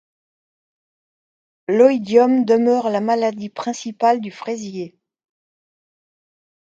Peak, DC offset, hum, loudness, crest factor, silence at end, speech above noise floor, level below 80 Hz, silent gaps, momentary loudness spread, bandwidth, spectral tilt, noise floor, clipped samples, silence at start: 0 dBFS; under 0.1%; none; -18 LUFS; 20 dB; 1.75 s; over 73 dB; -72 dBFS; none; 14 LU; 7.8 kHz; -5.5 dB/octave; under -90 dBFS; under 0.1%; 1.7 s